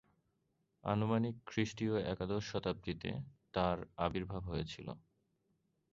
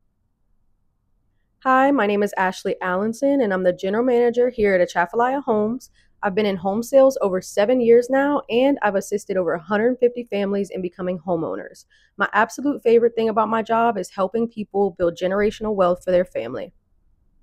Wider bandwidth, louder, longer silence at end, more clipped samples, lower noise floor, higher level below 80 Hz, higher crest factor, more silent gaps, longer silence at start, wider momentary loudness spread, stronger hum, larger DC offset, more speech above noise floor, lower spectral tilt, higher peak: second, 7.6 kHz vs 15 kHz; second, -39 LUFS vs -20 LUFS; first, 0.95 s vs 0.75 s; neither; first, -81 dBFS vs -66 dBFS; about the same, -58 dBFS vs -54 dBFS; about the same, 20 dB vs 16 dB; neither; second, 0.85 s vs 1.65 s; about the same, 10 LU vs 10 LU; neither; neither; about the same, 43 dB vs 46 dB; about the same, -5.5 dB/octave vs -5.5 dB/octave; second, -20 dBFS vs -4 dBFS